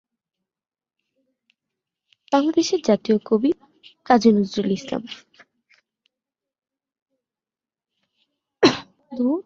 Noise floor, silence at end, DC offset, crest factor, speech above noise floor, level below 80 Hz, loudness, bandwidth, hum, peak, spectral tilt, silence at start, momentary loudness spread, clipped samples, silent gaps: under -90 dBFS; 0.05 s; under 0.1%; 22 dB; over 71 dB; -64 dBFS; -20 LUFS; 7.6 kHz; none; -2 dBFS; -5 dB/octave; 2.3 s; 14 LU; under 0.1%; 7.02-7.06 s